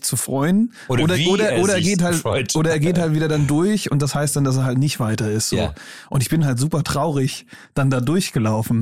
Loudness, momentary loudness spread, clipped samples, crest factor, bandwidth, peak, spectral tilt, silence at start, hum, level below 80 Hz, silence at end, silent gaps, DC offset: -19 LUFS; 5 LU; under 0.1%; 10 dB; 16 kHz; -8 dBFS; -5 dB/octave; 0 s; none; -46 dBFS; 0 s; none; 0.6%